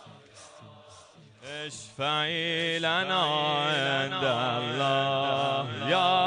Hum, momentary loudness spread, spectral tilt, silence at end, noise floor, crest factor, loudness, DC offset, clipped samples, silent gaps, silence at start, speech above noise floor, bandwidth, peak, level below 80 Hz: none; 12 LU; -4 dB/octave; 0 s; -53 dBFS; 18 dB; -27 LUFS; under 0.1%; under 0.1%; none; 0 s; 26 dB; 10 kHz; -10 dBFS; -72 dBFS